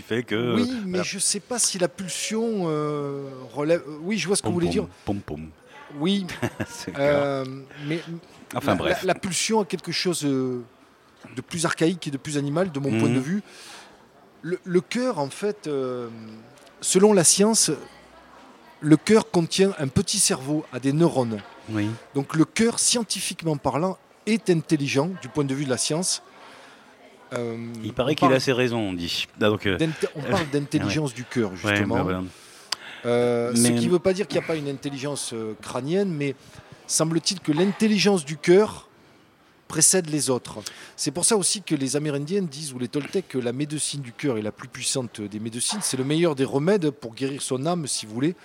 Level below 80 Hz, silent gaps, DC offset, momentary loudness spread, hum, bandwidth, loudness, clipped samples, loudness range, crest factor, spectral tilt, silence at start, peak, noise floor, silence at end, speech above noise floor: -60 dBFS; none; under 0.1%; 12 LU; none; 17 kHz; -24 LUFS; under 0.1%; 5 LU; 24 dB; -4 dB/octave; 0 s; 0 dBFS; -57 dBFS; 0.1 s; 33 dB